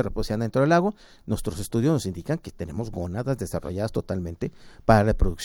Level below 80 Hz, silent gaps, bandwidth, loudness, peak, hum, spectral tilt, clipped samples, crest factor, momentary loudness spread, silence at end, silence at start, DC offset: -36 dBFS; none; 17.5 kHz; -26 LUFS; -4 dBFS; none; -7 dB/octave; under 0.1%; 22 dB; 13 LU; 0 s; 0 s; under 0.1%